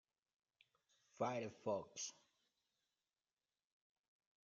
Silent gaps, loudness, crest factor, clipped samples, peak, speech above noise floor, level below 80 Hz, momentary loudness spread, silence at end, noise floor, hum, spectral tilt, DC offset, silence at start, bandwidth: none; -46 LUFS; 24 dB; under 0.1%; -28 dBFS; over 44 dB; under -90 dBFS; 6 LU; 2.35 s; under -90 dBFS; none; -4 dB/octave; under 0.1%; 1.2 s; 7.4 kHz